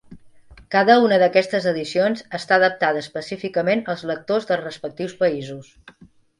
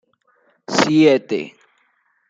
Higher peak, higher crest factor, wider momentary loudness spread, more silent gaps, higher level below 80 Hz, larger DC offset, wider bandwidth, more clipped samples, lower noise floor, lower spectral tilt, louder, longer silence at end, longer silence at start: about the same, 0 dBFS vs 0 dBFS; about the same, 20 dB vs 18 dB; about the same, 15 LU vs 13 LU; neither; about the same, -60 dBFS vs -64 dBFS; neither; first, 11.5 kHz vs 7.8 kHz; neither; second, -46 dBFS vs -63 dBFS; about the same, -5.5 dB/octave vs -5 dB/octave; second, -20 LUFS vs -16 LUFS; about the same, 0.75 s vs 0.8 s; second, 0.1 s vs 0.7 s